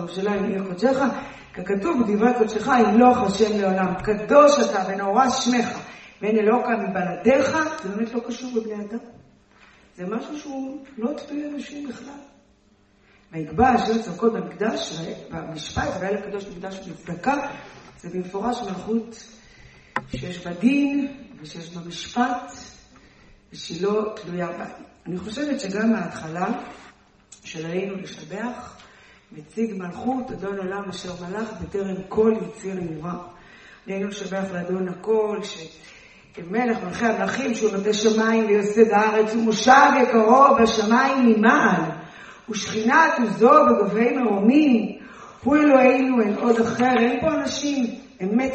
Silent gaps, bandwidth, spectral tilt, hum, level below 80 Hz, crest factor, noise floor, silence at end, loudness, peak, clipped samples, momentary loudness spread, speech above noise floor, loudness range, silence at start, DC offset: none; 8.4 kHz; -5 dB/octave; none; -52 dBFS; 20 dB; -58 dBFS; 0 s; -21 LUFS; -2 dBFS; under 0.1%; 19 LU; 37 dB; 13 LU; 0 s; under 0.1%